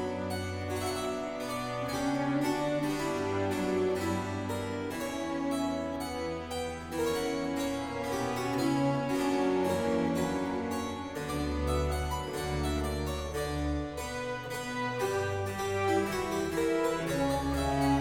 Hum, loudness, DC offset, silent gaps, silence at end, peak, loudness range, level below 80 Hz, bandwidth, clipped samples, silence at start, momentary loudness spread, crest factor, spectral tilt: none; -32 LUFS; under 0.1%; none; 0 s; -16 dBFS; 3 LU; -44 dBFS; 17.5 kHz; under 0.1%; 0 s; 6 LU; 16 dB; -5.5 dB/octave